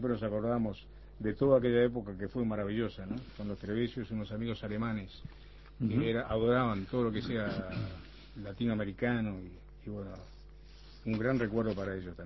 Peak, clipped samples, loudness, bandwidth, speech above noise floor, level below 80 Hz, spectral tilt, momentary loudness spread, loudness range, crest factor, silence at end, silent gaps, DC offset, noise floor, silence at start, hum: -14 dBFS; under 0.1%; -34 LUFS; 6 kHz; 19 dB; -52 dBFS; -6.5 dB/octave; 17 LU; 5 LU; 20 dB; 0 s; none; under 0.1%; -53 dBFS; 0 s; none